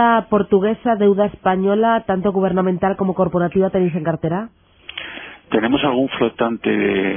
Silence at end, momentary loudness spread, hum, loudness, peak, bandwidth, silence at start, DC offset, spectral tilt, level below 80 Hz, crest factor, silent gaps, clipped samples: 0 s; 11 LU; none; -18 LUFS; -4 dBFS; 3.6 kHz; 0 s; under 0.1%; -11 dB/octave; -48 dBFS; 14 dB; none; under 0.1%